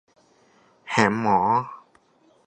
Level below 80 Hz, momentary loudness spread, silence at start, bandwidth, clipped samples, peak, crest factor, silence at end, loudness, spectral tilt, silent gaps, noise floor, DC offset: -60 dBFS; 6 LU; 0.85 s; 9.8 kHz; under 0.1%; -2 dBFS; 24 dB; 0.65 s; -22 LUFS; -5.5 dB/octave; none; -60 dBFS; under 0.1%